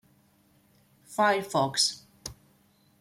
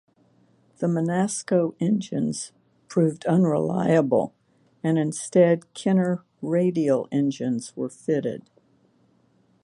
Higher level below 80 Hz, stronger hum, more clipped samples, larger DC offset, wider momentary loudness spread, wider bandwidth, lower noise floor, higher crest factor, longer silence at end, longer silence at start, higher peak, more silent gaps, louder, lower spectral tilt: about the same, -64 dBFS vs -68 dBFS; neither; neither; neither; first, 19 LU vs 10 LU; first, 16.5 kHz vs 11.5 kHz; about the same, -64 dBFS vs -63 dBFS; about the same, 20 dB vs 18 dB; second, 0.65 s vs 1.25 s; first, 1.1 s vs 0.8 s; second, -10 dBFS vs -6 dBFS; neither; about the same, -26 LUFS vs -24 LUFS; second, -2.5 dB/octave vs -6.5 dB/octave